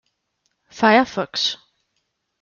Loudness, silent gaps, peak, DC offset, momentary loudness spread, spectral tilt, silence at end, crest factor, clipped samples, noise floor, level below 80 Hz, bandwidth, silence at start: -18 LUFS; none; -4 dBFS; under 0.1%; 8 LU; -3.5 dB/octave; 0.85 s; 20 dB; under 0.1%; -73 dBFS; -64 dBFS; 7.2 kHz; 0.75 s